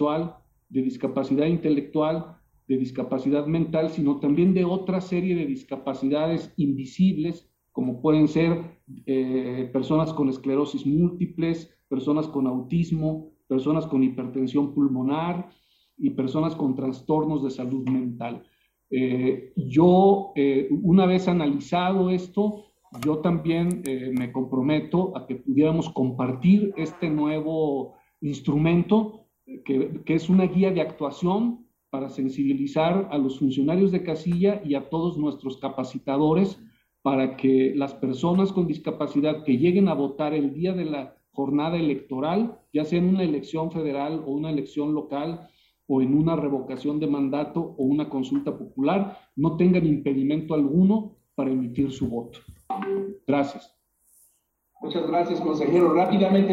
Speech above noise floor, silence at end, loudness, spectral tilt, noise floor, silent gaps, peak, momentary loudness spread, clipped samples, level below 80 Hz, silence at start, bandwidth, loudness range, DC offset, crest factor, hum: 45 dB; 0 s; -24 LUFS; -8.5 dB/octave; -69 dBFS; none; -6 dBFS; 10 LU; under 0.1%; -58 dBFS; 0 s; 10.5 kHz; 4 LU; under 0.1%; 18 dB; none